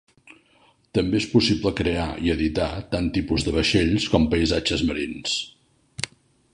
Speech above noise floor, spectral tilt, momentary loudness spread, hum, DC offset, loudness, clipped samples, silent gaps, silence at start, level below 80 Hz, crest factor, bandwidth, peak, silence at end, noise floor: 37 dB; -5 dB/octave; 11 LU; none; under 0.1%; -23 LUFS; under 0.1%; none; 0.95 s; -38 dBFS; 22 dB; 11 kHz; -2 dBFS; 0.45 s; -59 dBFS